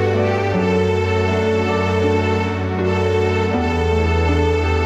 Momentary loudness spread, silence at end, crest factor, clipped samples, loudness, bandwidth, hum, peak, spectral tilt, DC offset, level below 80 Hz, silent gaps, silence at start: 2 LU; 0 s; 12 dB; under 0.1%; -18 LUFS; 8.4 kHz; none; -4 dBFS; -7 dB/octave; under 0.1%; -30 dBFS; none; 0 s